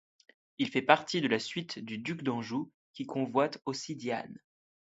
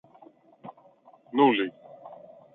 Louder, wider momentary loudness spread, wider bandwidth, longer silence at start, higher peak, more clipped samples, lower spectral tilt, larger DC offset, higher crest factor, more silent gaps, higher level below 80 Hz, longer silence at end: second, -32 LUFS vs -25 LUFS; second, 12 LU vs 26 LU; first, 8 kHz vs 4.1 kHz; about the same, 0.6 s vs 0.65 s; first, -4 dBFS vs -8 dBFS; neither; second, -5 dB/octave vs -8.5 dB/octave; neither; first, 28 dB vs 22 dB; first, 2.74-2.94 s vs none; about the same, -76 dBFS vs -80 dBFS; first, 0.55 s vs 0.4 s